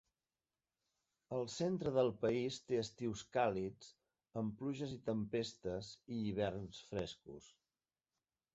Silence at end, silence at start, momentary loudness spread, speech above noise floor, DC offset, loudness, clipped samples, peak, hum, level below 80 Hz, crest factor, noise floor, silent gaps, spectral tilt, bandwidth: 1.05 s; 1.3 s; 12 LU; over 49 dB; under 0.1%; -41 LUFS; under 0.1%; -20 dBFS; none; -68 dBFS; 22 dB; under -90 dBFS; none; -5.5 dB/octave; 8 kHz